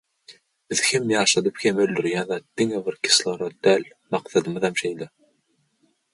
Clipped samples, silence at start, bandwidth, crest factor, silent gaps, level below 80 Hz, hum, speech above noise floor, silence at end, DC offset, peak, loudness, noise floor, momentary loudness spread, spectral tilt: under 0.1%; 0.3 s; 11.5 kHz; 20 dB; none; -66 dBFS; none; 46 dB; 1.05 s; under 0.1%; -4 dBFS; -22 LUFS; -69 dBFS; 11 LU; -3 dB/octave